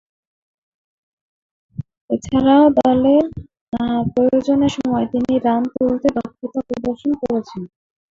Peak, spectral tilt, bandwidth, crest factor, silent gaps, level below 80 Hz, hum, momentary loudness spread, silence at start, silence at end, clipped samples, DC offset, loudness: -2 dBFS; -7 dB/octave; 7.8 kHz; 16 dB; 1.97-2.08 s, 3.61-3.67 s; -46 dBFS; none; 20 LU; 1.8 s; 0.45 s; under 0.1%; under 0.1%; -17 LUFS